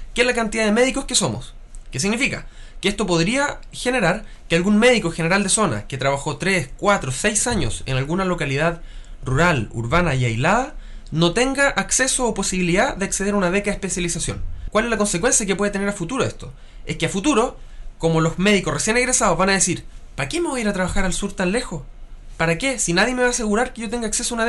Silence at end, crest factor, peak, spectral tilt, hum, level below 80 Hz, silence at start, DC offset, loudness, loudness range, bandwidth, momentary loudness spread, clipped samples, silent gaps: 0 s; 16 dB; -4 dBFS; -3.5 dB/octave; none; -34 dBFS; 0 s; under 0.1%; -20 LUFS; 3 LU; 12 kHz; 9 LU; under 0.1%; none